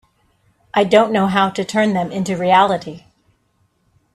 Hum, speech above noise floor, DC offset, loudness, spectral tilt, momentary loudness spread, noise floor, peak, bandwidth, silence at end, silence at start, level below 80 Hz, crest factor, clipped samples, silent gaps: none; 47 dB; under 0.1%; -16 LUFS; -5.5 dB/octave; 8 LU; -63 dBFS; 0 dBFS; 13 kHz; 1.15 s; 0.75 s; -58 dBFS; 18 dB; under 0.1%; none